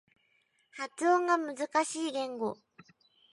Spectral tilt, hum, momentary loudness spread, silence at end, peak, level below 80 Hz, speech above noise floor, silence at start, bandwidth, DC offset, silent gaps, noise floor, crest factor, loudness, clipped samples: -3 dB/octave; none; 14 LU; 0.8 s; -14 dBFS; -86 dBFS; 42 dB; 0.75 s; 11.5 kHz; under 0.1%; none; -73 dBFS; 18 dB; -31 LUFS; under 0.1%